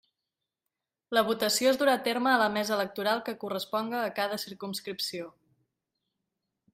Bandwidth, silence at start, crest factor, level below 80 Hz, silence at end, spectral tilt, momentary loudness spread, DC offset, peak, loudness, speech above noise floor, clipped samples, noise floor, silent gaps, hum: 16 kHz; 1.1 s; 22 dB; -76 dBFS; 1.45 s; -3 dB/octave; 11 LU; under 0.1%; -10 dBFS; -29 LUFS; 59 dB; under 0.1%; -88 dBFS; none; none